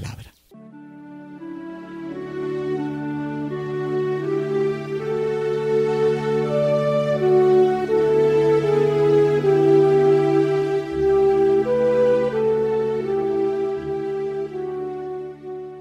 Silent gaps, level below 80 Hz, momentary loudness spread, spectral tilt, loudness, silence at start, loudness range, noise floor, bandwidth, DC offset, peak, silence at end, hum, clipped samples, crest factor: none; -52 dBFS; 16 LU; -8 dB/octave; -20 LUFS; 0 s; 10 LU; -45 dBFS; 8.8 kHz; under 0.1%; -6 dBFS; 0 s; none; under 0.1%; 14 dB